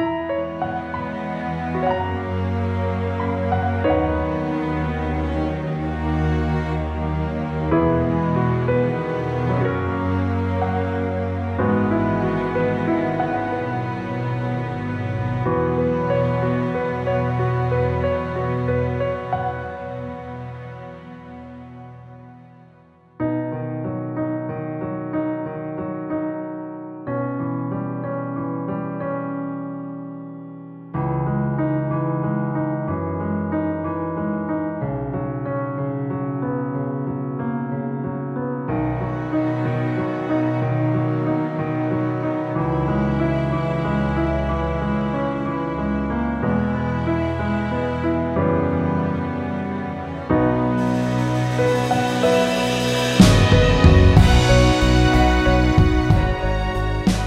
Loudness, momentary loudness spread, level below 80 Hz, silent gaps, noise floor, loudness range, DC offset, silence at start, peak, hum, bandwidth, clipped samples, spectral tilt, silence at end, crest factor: -22 LUFS; 11 LU; -30 dBFS; none; -50 dBFS; 11 LU; under 0.1%; 0 s; 0 dBFS; none; 14 kHz; under 0.1%; -7 dB/octave; 0 s; 20 dB